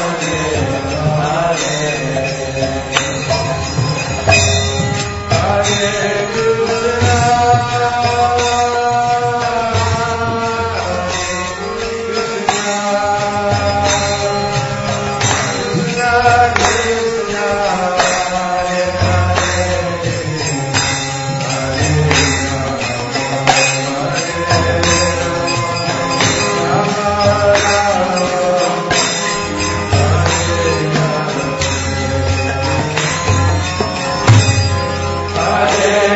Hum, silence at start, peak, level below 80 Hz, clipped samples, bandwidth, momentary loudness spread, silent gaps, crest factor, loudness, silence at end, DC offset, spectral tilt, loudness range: none; 0 s; 0 dBFS; -34 dBFS; under 0.1%; 8 kHz; 6 LU; none; 14 dB; -14 LUFS; 0 s; under 0.1%; -4 dB/octave; 3 LU